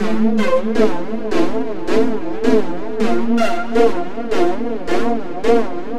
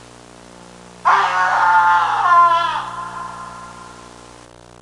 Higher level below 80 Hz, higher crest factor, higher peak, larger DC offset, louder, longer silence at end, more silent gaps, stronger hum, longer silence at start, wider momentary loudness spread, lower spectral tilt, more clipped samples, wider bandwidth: first, -42 dBFS vs -56 dBFS; about the same, 16 dB vs 16 dB; about the same, 0 dBFS vs -2 dBFS; first, 10% vs under 0.1%; second, -18 LUFS vs -15 LUFS; second, 0 s vs 0.8 s; neither; second, none vs 60 Hz at -45 dBFS; second, 0 s vs 1.05 s; second, 6 LU vs 21 LU; first, -6 dB/octave vs -2.5 dB/octave; neither; first, 13 kHz vs 11.5 kHz